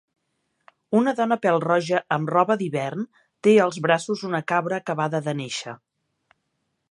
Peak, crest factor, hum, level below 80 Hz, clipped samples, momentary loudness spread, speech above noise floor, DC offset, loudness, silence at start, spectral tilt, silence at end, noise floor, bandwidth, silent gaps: -4 dBFS; 20 dB; none; -74 dBFS; under 0.1%; 11 LU; 53 dB; under 0.1%; -23 LUFS; 0.9 s; -5.5 dB/octave; 1.15 s; -75 dBFS; 11.5 kHz; none